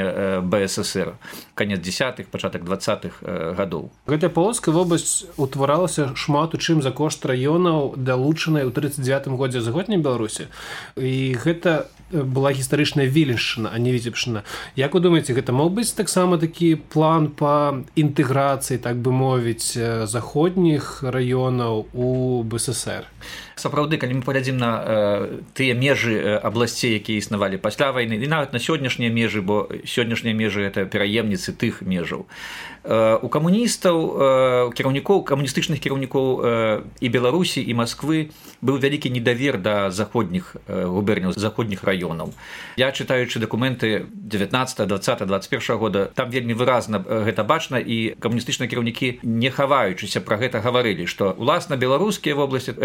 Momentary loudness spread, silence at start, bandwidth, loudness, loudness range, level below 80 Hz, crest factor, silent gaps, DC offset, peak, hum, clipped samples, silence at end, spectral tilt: 7 LU; 0 s; 17 kHz; -21 LUFS; 4 LU; -52 dBFS; 18 dB; none; under 0.1%; -4 dBFS; none; under 0.1%; 0 s; -5 dB/octave